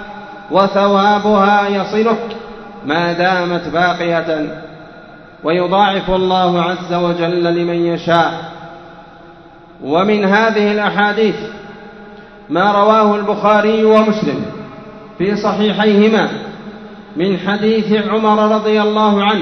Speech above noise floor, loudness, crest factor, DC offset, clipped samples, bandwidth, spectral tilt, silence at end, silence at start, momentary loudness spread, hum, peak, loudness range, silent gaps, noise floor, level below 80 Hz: 26 dB; -14 LUFS; 14 dB; under 0.1%; under 0.1%; 6.4 kHz; -6.5 dB/octave; 0 s; 0 s; 19 LU; none; 0 dBFS; 3 LU; none; -39 dBFS; -48 dBFS